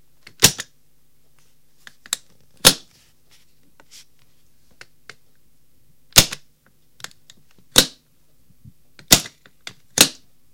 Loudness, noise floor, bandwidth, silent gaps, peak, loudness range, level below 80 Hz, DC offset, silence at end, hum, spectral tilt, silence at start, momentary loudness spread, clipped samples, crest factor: -16 LUFS; -63 dBFS; 17 kHz; none; 0 dBFS; 3 LU; -46 dBFS; 0.4%; 0.45 s; none; -1 dB/octave; 0.4 s; 25 LU; under 0.1%; 24 dB